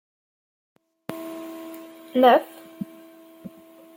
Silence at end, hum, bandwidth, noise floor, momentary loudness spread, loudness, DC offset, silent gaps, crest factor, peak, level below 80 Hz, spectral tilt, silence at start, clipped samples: 0.5 s; none; 17 kHz; -48 dBFS; 27 LU; -20 LUFS; under 0.1%; none; 22 dB; -4 dBFS; -76 dBFS; -5 dB/octave; 1.1 s; under 0.1%